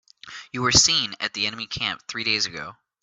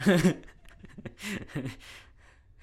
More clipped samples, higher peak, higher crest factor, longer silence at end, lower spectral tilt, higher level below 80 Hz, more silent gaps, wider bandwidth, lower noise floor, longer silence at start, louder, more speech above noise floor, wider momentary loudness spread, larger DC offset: neither; first, -2 dBFS vs -12 dBFS; about the same, 24 dB vs 20 dB; second, 0.3 s vs 0.65 s; second, -1 dB/octave vs -6 dB/octave; about the same, -50 dBFS vs -54 dBFS; neither; second, 8.6 kHz vs 15.5 kHz; second, -43 dBFS vs -57 dBFS; first, 0.25 s vs 0 s; first, -21 LUFS vs -31 LUFS; second, 19 dB vs 29 dB; about the same, 22 LU vs 24 LU; neither